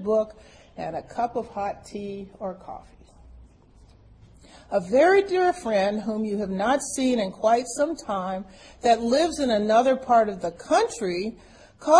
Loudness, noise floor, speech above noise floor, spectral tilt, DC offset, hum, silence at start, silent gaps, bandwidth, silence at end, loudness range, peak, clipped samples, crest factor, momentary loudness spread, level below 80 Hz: -24 LUFS; -53 dBFS; 29 dB; -4.5 dB/octave; under 0.1%; none; 0 s; none; 10.5 kHz; 0 s; 11 LU; -4 dBFS; under 0.1%; 20 dB; 15 LU; -54 dBFS